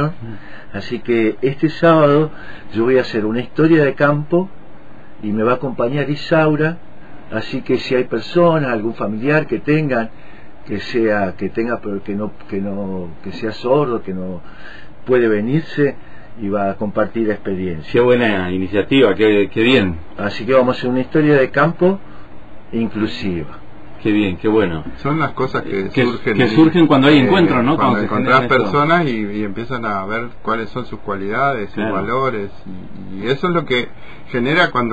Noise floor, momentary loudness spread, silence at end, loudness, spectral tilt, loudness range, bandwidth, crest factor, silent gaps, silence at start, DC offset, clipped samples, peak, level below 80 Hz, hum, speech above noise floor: -40 dBFS; 14 LU; 0 s; -17 LUFS; -8 dB/octave; 7 LU; 8 kHz; 16 dB; none; 0 s; 4%; under 0.1%; 0 dBFS; -46 dBFS; none; 23 dB